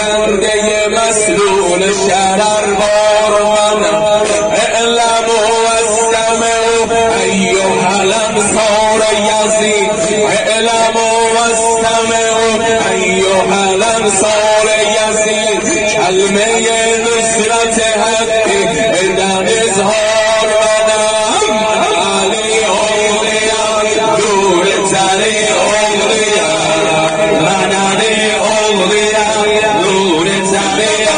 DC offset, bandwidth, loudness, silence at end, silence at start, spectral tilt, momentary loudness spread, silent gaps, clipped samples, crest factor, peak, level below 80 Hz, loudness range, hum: under 0.1%; 10 kHz; -10 LUFS; 0 s; 0 s; -2.5 dB/octave; 1 LU; none; under 0.1%; 10 dB; 0 dBFS; -40 dBFS; 0 LU; none